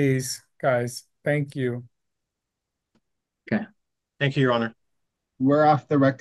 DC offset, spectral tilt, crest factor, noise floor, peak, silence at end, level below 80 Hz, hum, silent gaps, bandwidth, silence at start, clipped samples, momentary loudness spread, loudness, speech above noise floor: under 0.1%; -6 dB/octave; 18 dB; -84 dBFS; -8 dBFS; 0.05 s; -68 dBFS; none; none; 12.5 kHz; 0 s; under 0.1%; 12 LU; -24 LUFS; 61 dB